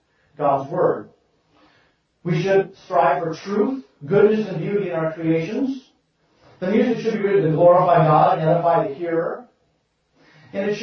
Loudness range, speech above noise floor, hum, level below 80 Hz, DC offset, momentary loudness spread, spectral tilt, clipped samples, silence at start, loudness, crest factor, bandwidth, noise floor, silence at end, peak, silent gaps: 5 LU; 48 dB; none; -62 dBFS; under 0.1%; 12 LU; -8 dB/octave; under 0.1%; 0.4 s; -19 LUFS; 16 dB; 6.6 kHz; -67 dBFS; 0 s; -4 dBFS; none